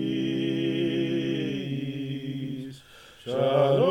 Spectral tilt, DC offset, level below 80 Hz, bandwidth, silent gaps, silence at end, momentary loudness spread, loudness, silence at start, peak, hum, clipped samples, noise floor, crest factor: -7.5 dB/octave; under 0.1%; -64 dBFS; 15.5 kHz; none; 0 s; 14 LU; -28 LUFS; 0 s; -10 dBFS; none; under 0.1%; -50 dBFS; 16 dB